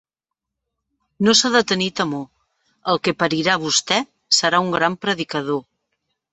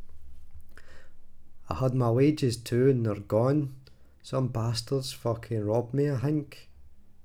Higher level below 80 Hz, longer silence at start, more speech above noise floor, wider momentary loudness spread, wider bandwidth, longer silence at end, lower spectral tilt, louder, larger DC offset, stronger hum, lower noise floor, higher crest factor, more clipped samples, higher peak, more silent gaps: second, -62 dBFS vs -52 dBFS; first, 1.2 s vs 0 s; first, 66 dB vs 21 dB; about the same, 10 LU vs 9 LU; second, 8.4 kHz vs 16 kHz; first, 0.7 s vs 0 s; second, -3 dB/octave vs -7 dB/octave; first, -18 LUFS vs -28 LUFS; neither; neither; first, -85 dBFS vs -48 dBFS; about the same, 20 dB vs 16 dB; neither; first, 0 dBFS vs -12 dBFS; neither